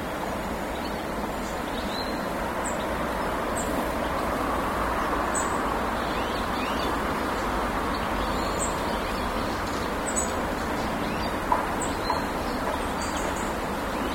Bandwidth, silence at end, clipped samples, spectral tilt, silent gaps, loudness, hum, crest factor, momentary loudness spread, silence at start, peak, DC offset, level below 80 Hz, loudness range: 16.5 kHz; 0 s; under 0.1%; -4 dB/octave; none; -28 LUFS; none; 20 dB; 4 LU; 0 s; -8 dBFS; under 0.1%; -40 dBFS; 2 LU